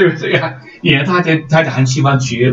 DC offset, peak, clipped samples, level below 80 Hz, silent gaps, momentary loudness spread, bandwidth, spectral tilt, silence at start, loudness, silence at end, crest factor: under 0.1%; 0 dBFS; under 0.1%; -48 dBFS; none; 4 LU; 7.8 kHz; -5.5 dB/octave; 0 s; -13 LUFS; 0 s; 12 dB